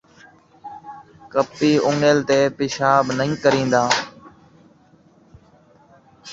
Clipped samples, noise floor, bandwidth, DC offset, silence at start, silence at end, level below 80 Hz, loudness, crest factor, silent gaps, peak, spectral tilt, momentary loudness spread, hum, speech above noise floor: under 0.1%; -53 dBFS; 8 kHz; under 0.1%; 0.65 s; 0 s; -58 dBFS; -18 LUFS; 20 dB; none; -2 dBFS; -4.5 dB/octave; 21 LU; none; 36 dB